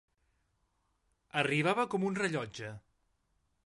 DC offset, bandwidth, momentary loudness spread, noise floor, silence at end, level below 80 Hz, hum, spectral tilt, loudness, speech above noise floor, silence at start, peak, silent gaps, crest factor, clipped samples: under 0.1%; 11.5 kHz; 14 LU; -77 dBFS; 0.85 s; -72 dBFS; none; -5.5 dB/octave; -33 LUFS; 45 dB; 1.35 s; -14 dBFS; none; 22 dB; under 0.1%